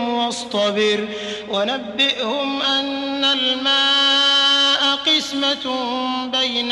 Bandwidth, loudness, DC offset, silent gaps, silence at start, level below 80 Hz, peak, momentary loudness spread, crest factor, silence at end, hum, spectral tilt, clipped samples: 12.5 kHz; -17 LUFS; under 0.1%; none; 0 s; -62 dBFS; -6 dBFS; 10 LU; 12 dB; 0 s; none; -2 dB/octave; under 0.1%